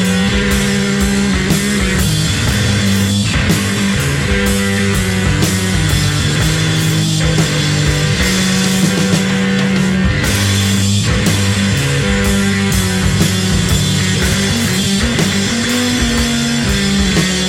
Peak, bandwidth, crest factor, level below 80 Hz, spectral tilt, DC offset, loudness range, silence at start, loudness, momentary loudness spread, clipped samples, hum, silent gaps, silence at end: 0 dBFS; 16.5 kHz; 12 dB; -24 dBFS; -4 dB/octave; under 0.1%; 1 LU; 0 s; -13 LUFS; 1 LU; under 0.1%; none; none; 0 s